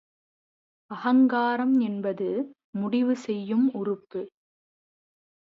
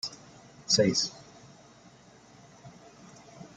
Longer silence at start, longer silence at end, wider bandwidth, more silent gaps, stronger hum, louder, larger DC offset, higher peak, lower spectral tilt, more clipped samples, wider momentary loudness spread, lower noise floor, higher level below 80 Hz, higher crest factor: first, 0.9 s vs 0.05 s; first, 1.3 s vs 0.1 s; second, 7.4 kHz vs 11 kHz; first, 2.64-2.73 s vs none; neither; about the same, -26 LUFS vs -27 LUFS; neither; about the same, -12 dBFS vs -10 dBFS; first, -7.5 dB/octave vs -3 dB/octave; neither; second, 14 LU vs 28 LU; first, under -90 dBFS vs -56 dBFS; second, -80 dBFS vs -68 dBFS; second, 14 dB vs 24 dB